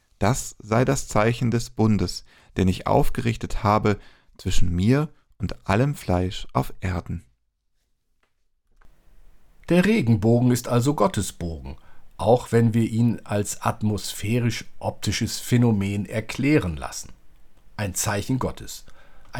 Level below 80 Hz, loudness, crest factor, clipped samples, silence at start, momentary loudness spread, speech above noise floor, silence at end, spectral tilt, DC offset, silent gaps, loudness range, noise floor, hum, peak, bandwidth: -38 dBFS; -23 LUFS; 18 dB; under 0.1%; 0.2 s; 13 LU; 48 dB; 0 s; -6 dB/octave; under 0.1%; none; 6 LU; -70 dBFS; none; -6 dBFS; 18.5 kHz